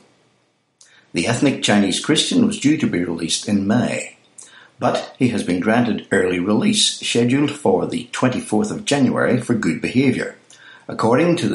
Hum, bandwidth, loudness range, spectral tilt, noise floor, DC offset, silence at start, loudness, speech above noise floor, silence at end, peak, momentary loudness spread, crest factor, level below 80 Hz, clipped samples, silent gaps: none; 11.5 kHz; 2 LU; -4.5 dB/octave; -63 dBFS; under 0.1%; 1.15 s; -18 LUFS; 45 dB; 0 s; -2 dBFS; 7 LU; 16 dB; -58 dBFS; under 0.1%; none